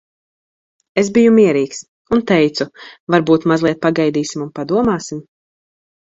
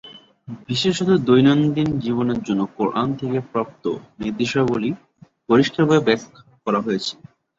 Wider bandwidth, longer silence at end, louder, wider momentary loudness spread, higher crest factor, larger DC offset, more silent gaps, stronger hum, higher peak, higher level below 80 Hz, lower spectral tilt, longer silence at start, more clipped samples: about the same, 7.8 kHz vs 7.8 kHz; first, 0.9 s vs 0.45 s; first, -15 LUFS vs -20 LUFS; about the same, 14 LU vs 12 LU; about the same, 16 dB vs 18 dB; neither; first, 1.88-2.05 s, 3.00-3.07 s vs none; neither; about the same, 0 dBFS vs -2 dBFS; about the same, -52 dBFS vs -54 dBFS; about the same, -6 dB/octave vs -6.5 dB/octave; first, 0.95 s vs 0.05 s; neither